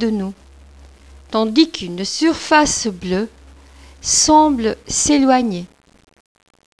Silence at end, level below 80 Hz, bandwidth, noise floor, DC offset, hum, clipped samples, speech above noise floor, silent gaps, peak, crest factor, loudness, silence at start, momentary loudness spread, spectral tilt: 1.15 s; -42 dBFS; 11 kHz; -43 dBFS; 0.1%; none; under 0.1%; 27 dB; none; 0 dBFS; 18 dB; -16 LUFS; 0 s; 12 LU; -3 dB/octave